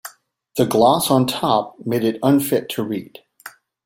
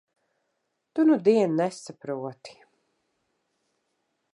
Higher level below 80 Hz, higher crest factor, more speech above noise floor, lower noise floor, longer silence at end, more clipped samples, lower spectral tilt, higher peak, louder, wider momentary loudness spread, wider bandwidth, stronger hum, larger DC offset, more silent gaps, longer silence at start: first, -58 dBFS vs -82 dBFS; about the same, 18 dB vs 20 dB; second, 29 dB vs 54 dB; second, -47 dBFS vs -78 dBFS; second, 0.35 s vs 1.85 s; neither; about the same, -5.5 dB/octave vs -6.5 dB/octave; first, -2 dBFS vs -8 dBFS; first, -19 LUFS vs -24 LUFS; about the same, 14 LU vs 16 LU; first, 16.5 kHz vs 11 kHz; neither; neither; neither; second, 0.05 s vs 0.95 s